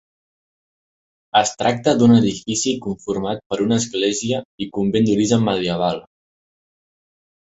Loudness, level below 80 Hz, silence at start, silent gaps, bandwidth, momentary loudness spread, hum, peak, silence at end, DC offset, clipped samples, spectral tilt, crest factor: -19 LUFS; -54 dBFS; 1.35 s; 3.46-3.50 s, 4.45-4.58 s; 8.2 kHz; 10 LU; none; -2 dBFS; 1.55 s; under 0.1%; under 0.1%; -5 dB/octave; 18 dB